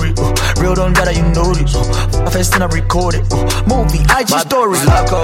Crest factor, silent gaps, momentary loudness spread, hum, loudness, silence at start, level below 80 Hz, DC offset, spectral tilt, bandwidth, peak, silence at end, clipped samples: 12 dB; none; 4 LU; none; -13 LUFS; 0 s; -16 dBFS; under 0.1%; -5 dB/octave; 16.5 kHz; 0 dBFS; 0 s; under 0.1%